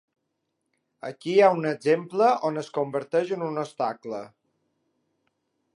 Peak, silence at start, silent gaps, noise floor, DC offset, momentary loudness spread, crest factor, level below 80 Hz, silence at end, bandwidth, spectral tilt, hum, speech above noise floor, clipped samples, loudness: -6 dBFS; 1.05 s; none; -79 dBFS; under 0.1%; 16 LU; 20 dB; -82 dBFS; 1.5 s; 11 kHz; -6 dB/octave; none; 54 dB; under 0.1%; -25 LUFS